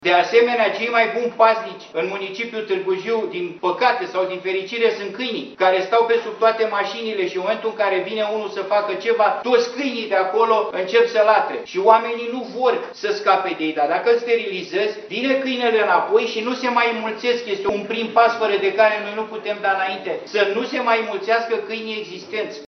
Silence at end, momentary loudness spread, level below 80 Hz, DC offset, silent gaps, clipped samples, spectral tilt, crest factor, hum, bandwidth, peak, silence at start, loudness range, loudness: 0 s; 9 LU; -70 dBFS; under 0.1%; none; under 0.1%; -4 dB/octave; 20 dB; none; 6.4 kHz; 0 dBFS; 0 s; 3 LU; -20 LUFS